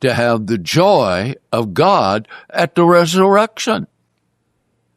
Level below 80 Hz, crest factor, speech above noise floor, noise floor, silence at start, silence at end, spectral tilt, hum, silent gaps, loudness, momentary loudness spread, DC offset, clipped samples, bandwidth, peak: -58 dBFS; 14 dB; 52 dB; -66 dBFS; 0 s; 1.1 s; -5.5 dB/octave; none; none; -14 LUFS; 9 LU; under 0.1%; under 0.1%; 14 kHz; -2 dBFS